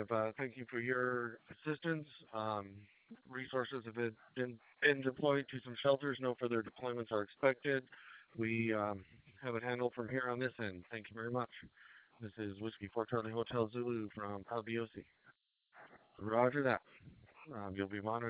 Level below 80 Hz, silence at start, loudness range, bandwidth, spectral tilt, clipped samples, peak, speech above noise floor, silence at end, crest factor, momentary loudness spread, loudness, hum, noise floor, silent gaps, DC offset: -72 dBFS; 0 s; 6 LU; 4 kHz; -4.5 dB/octave; under 0.1%; -16 dBFS; 31 dB; 0 s; 24 dB; 14 LU; -39 LUFS; none; -71 dBFS; none; under 0.1%